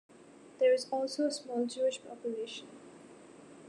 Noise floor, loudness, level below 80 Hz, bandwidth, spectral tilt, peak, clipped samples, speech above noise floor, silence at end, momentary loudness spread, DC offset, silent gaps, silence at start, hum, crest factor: -56 dBFS; -33 LUFS; -84 dBFS; 11 kHz; -3 dB/octave; -18 dBFS; under 0.1%; 23 dB; 0 s; 25 LU; under 0.1%; none; 0.2 s; none; 18 dB